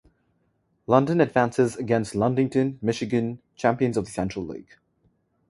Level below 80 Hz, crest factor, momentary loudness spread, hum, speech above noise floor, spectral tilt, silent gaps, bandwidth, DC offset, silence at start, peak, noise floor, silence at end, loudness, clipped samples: -56 dBFS; 22 dB; 11 LU; none; 46 dB; -7 dB/octave; none; 11.5 kHz; under 0.1%; 0.9 s; -4 dBFS; -70 dBFS; 0.9 s; -24 LUFS; under 0.1%